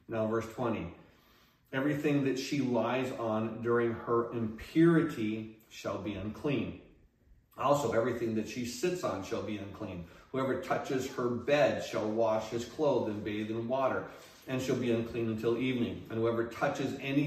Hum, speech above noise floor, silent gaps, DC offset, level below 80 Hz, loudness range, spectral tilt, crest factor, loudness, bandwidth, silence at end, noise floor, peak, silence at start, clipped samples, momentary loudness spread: none; 33 dB; none; under 0.1%; -64 dBFS; 4 LU; -6 dB/octave; 20 dB; -33 LUFS; 15 kHz; 0 s; -65 dBFS; -14 dBFS; 0.1 s; under 0.1%; 10 LU